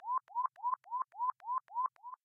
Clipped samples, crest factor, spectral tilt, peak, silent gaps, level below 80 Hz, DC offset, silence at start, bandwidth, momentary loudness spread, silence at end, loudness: under 0.1%; 14 dB; -1.5 dB/octave; -24 dBFS; none; under -90 dBFS; under 0.1%; 0 s; 3 kHz; 3 LU; 0.1 s; -38 LUFS